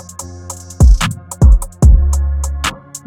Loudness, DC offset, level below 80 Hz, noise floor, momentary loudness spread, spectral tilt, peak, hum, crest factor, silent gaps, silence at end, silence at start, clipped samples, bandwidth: -13 LUFS; under 0.1%; -12 dBFS; -30 dBFS; 18 LU; -5 dB/octave; 0 dBFS; none; 12 dB; none; 0.1 s; 0.2 s; under 0.1%; 15 kHz